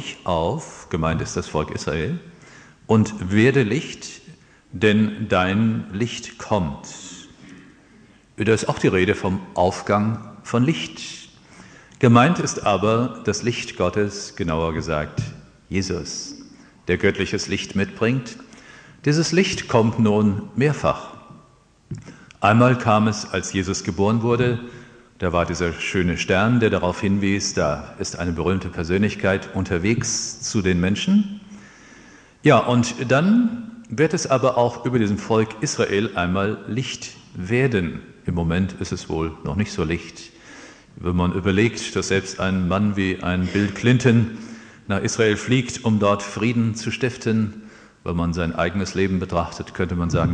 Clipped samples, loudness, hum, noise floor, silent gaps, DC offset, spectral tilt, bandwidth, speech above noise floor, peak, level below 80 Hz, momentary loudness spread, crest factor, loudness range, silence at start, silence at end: under 0.1%; -21 LUFS; none; -54 dBFS; none; under 0.1%; -5.5 dB/octave; 9.8 kHz; 33 dB; 0 dBFS; -44 dBFS; 13 LU; 22 dB; 4 LU; 0 s; 0 s